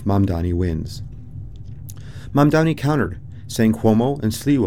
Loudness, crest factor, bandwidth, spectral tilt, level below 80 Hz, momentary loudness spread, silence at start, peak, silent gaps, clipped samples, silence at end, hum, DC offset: -19 LUFS; 18 dB; 17.5 kHz; -7 dB/octave; -40 dBFS; 20 LU; 0 s; -2 dBFS; none; under 0.1%; 0 s; none; 1%